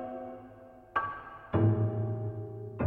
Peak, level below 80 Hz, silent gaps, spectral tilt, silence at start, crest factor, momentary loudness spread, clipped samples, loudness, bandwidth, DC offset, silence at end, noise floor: -16 dBFS; -60 dBFS; none; -10.5 dB/octave; 0 s; 18 dB; 19 LU; under 0.1%; -33 LUFS; 3.6 kHz; under 0.1%; 0 s; -52 dBFS